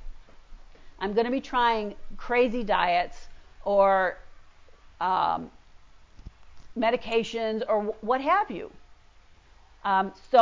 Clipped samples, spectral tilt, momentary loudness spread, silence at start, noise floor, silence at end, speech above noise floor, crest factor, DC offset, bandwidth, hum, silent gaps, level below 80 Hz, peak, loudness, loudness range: under 0.1%; -5.5 dB/octave; 14 LU; 0 s; -54 dBFS; 0 s; 29 dB; 20 dB; under 0.1%; 7.6 kHz; none; none; -50 dBFS; -6 dBFS; -26 LUFS; 4 LU